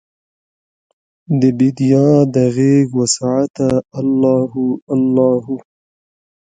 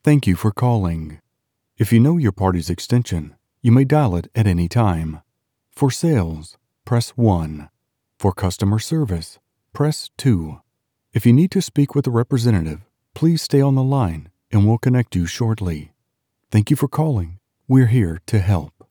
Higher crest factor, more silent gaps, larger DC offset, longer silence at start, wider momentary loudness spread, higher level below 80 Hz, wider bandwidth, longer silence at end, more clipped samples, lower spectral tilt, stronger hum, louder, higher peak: about the same, 16 dB vs 16 dB; first, 3.50-3.54 s, 4.82-4.87 s vs none; neither; first, 1.3 s vs 0.05 s; second, 7 LU vs 12 LU; second, -54 dBFS vs -40 dBFS; second, 9.4 kHz vs 19 kHz; first, 0.9 s vs 0.25 s; neither; about the same, -6.5 dB/octave vs -7 dB/octave; neither; first, -14 LUFS vs -19 LUFS; first, 0 dBFS vs -4 dBFS